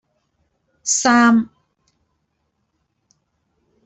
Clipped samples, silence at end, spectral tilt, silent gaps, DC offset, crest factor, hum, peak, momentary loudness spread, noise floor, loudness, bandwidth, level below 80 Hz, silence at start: under 0.1%; 2.4 s; -2.5 dB/octave; none; under 0.1%; 20 dB; none; -2 dBFS; 16 LU; -71 dBFS; -15 LUFS; 8.4 kHz; -64 dBFS; 0.85 s